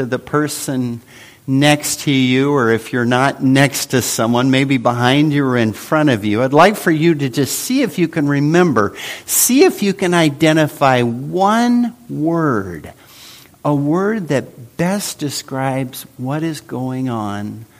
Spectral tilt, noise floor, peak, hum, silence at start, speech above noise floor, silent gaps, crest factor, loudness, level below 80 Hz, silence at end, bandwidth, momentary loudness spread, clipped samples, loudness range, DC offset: -5 dB/octave; -41 dBFS; 0 dBFS; none; 0 s; 25 dB; none; 16 dB; -15 LUFS; -54 dBFS; 0.15 s; 15.5 kHz; 10 LU; under 0.1%; 6 LU; under 0.1%